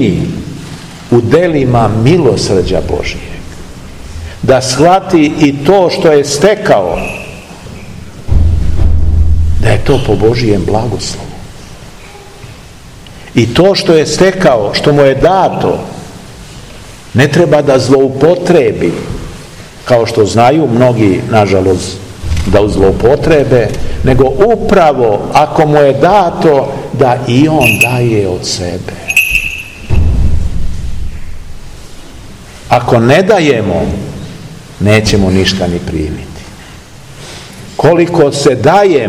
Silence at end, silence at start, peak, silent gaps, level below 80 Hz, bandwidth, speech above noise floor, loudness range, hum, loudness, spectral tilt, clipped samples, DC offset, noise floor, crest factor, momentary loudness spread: 0 s; 0 s; 0 dBFS; none; -22 dBFS; 17 kHz; 23 dB; 5 LU; none; -9 LUFS; -6 dB/octave; 3%; 0.7%; -32 dBFS; 10 dB; 20 LU